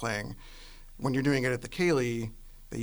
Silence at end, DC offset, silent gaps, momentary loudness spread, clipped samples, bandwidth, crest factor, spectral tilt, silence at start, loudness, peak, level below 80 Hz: 0 s; under 0.1%; none; 22 LU; under 0.1%; over 20 kHz; 18 dB; -6 dB/octave; 0 s; -30 LUFS; -14 dBFS; -48 dBFS